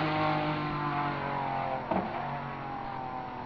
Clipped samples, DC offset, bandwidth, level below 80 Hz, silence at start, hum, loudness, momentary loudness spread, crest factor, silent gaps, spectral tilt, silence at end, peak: under 0.1%; 0.1%; 5.4 kHz; -56 dBFS; 0 s; none; -33 LUFS; 8 LU; 16 dB; none; -8 dB/octave; 0 s; -16 dBFS